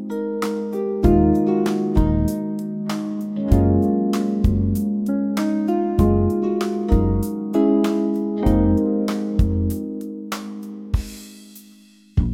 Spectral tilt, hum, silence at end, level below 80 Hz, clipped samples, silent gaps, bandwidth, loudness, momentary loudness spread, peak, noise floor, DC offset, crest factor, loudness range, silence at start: -8 dB/octave; none; 0 s; -28 dBFS; under 0.1%; none; 16.5 kHz; -21 LUFS; 10 LU; -4 dBFS; -49 dBFS; under 0.1%; 16 dB; 3 LU; 0 s